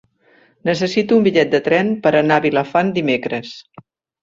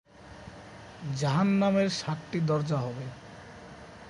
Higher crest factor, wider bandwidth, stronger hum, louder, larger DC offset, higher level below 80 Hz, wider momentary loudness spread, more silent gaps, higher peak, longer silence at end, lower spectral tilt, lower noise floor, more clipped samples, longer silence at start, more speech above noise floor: about the same, 16 dB vs 16 dB; second, 7.8 kHz vs 11 kHz; neither; first, -16 LUFS vs -28 LUFS; neither; about the same, -58 dBFS vs -60 dBFS; second, 11 LU vs 22 LU; neither; first, -2 dBFS vs -14 dBFS; first, 0.6 s vs 0 s; about the same, -6 dB/octave vs -6.5 dB/octave; first, -54 dBFS vs -48 dBFS; neither; first, 0.65 s vs 0.2 s; first, 38 dB vs 20 dB